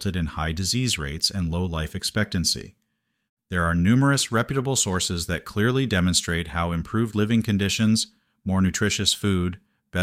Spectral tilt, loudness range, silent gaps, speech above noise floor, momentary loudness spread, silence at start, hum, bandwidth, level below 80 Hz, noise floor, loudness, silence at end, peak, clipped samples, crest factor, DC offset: -4 dB/octave; 3 LU; 3.29-3.37 s; 52 dB; 7 LU; 0 s; none; 16 kHz; -42 dBFS; -75 dBFS; -23 LUFS; 0 s; -6 dBFS; under 0.1%; 18 dB; under 0.1%